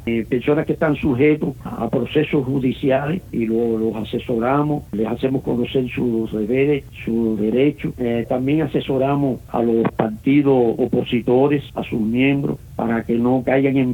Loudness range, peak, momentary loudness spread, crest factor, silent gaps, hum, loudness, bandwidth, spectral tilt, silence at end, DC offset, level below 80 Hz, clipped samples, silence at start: 2 LU; -4 dBFS; 6 LU; 16 dB; none; none; -19 LUFS; 18 kHz; -8.5 dB/octave; 0 s; under 0.1%; -44 dBFS; under 0.1%; 0 s